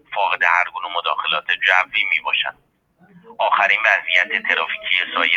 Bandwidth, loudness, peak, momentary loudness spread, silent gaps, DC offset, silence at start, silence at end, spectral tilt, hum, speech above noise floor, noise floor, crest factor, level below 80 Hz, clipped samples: 15 kHz; -17 LUFS; 0 dBFS; 7 LU; none; under 0.1%; 0.1 s; 0 s; -1 dB/octave; none; 33 dB; -52 dBFS; 20 dB; -68 dBFS; under 0.1%